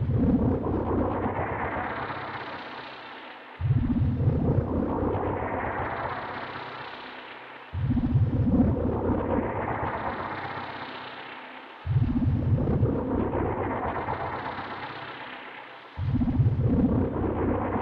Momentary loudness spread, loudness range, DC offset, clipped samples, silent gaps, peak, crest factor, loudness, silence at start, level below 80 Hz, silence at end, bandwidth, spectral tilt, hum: 15 LU; 4 LU; under 0.1%; under 0.1%; none; -12 dBFS; 16 dB; -28 LUFS; 0 s; -38 dBFS; 0 s; 5.2 kHz; -10.5 dB/octave; none